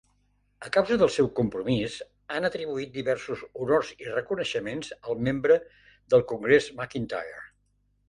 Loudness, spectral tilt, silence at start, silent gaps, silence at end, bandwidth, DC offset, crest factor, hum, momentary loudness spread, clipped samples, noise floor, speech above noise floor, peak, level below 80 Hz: -27 LUFS; -5.5 dB/octave; 0.6 s; none; 0.65 s; 11 kHz; under 0.1%; 22 dB; 50 Hz at -55 dBFS; 12 LU; under 0.1%; -69 dBFS; 43 dB; -6 dBFS; -58 dBFS